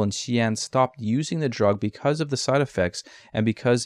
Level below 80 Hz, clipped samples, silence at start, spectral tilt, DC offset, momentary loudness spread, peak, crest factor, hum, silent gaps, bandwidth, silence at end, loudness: -58 dBFS; under 0.1%; 0 s; -5.5 dB/octave; under 0.1%; 4 LU; -8 dBFS; 16 dB; none; none; 12 kHz; 0 s; -24 LUFS